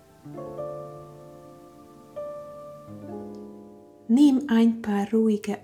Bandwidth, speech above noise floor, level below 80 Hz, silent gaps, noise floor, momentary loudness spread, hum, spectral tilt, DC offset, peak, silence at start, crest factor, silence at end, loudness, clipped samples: 14 kHz; 27 dB; -66 dBFS; none; -49 dBFS; 25 LU; none; -7 dB/octave; under 0.1%; -10 dBFS; 0.25 s; 18 dB; 0.05 s; -23 LUFS; under 0.1%